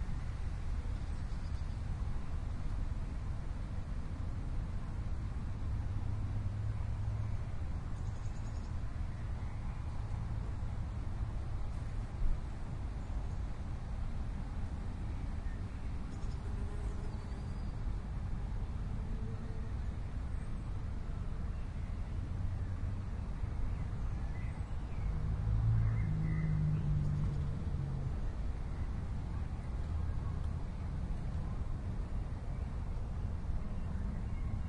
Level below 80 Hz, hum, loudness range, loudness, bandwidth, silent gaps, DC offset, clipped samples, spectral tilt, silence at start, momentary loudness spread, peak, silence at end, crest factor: -40 dBFS; none; 6 LU; -41 LUFS; 10.5 kHz; none; under 0.1%; under 0.1%; -8 dB/octave; 0 s; 7 LU; -22 dBFS; 0 s; 16 dB